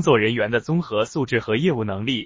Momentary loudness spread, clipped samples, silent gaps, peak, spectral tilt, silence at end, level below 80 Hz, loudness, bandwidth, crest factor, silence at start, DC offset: 6 LU; under 0.1%; none; -4 dBFS; -6 dB/octave; 0 s; -52 dBFS; -22 LUFS; 7.6 kHz; 16 dB; 0 s; under 0.1%